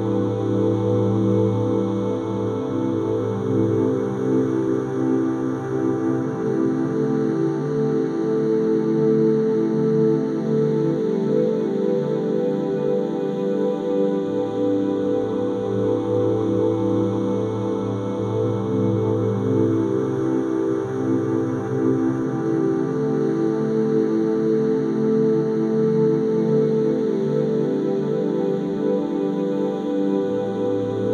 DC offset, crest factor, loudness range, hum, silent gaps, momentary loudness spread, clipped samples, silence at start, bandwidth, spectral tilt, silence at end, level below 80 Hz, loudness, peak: under 0.1%; 14 dB; 2 LU; none; none; 4 LU; under 0.1%; 0 s; 9.2 kHz; -9 dB/octave; 0 s; -58 dBFS; -21 LUFS; -6 dBFS